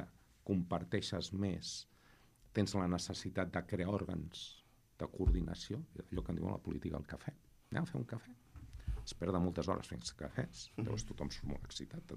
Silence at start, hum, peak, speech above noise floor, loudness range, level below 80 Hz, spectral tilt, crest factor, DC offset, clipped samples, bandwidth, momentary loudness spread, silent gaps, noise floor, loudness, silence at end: 0 s; none; -20 dBFS; 26 dB; 4 LU; -50 dBFS; -5.5 dB/octave; 20 dB; under 0.1%; under 0.1%; 14.5 kHz; 12 LU; none; -66 dBFS; -41 LUFS; 0 s